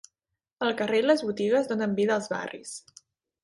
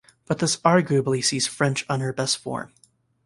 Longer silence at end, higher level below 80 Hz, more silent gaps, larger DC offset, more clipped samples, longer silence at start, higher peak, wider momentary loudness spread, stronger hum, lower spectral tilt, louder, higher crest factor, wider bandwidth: about the same, 0.65 s vs 0.6 s; second, -72 dBFS vs -62 dBFS; neither; neither; neither; first, 0.6 s vs 0.3 s; second, -10 dBFS vs -2 dBFS; first, 15 LU vs 12 LU; neither; about the same, -4.5 dB/octave vs -4 dB/octave; second, -26 LUFS vs -23 LUFS; about the same, 18 dB vs 22 dB; about the same, 11.5 kHz vs 11.5 kHz